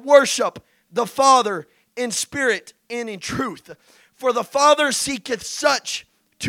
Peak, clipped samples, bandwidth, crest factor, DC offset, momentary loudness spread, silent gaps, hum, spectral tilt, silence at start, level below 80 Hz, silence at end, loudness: 0 dBFS; under 0.1%; 16.5 kHz; 20 dB; under 0.1%; 15 LU; none; none; -2 dB/octave; 0.05 s; -60 dBFS; 0 s; -20 LUFS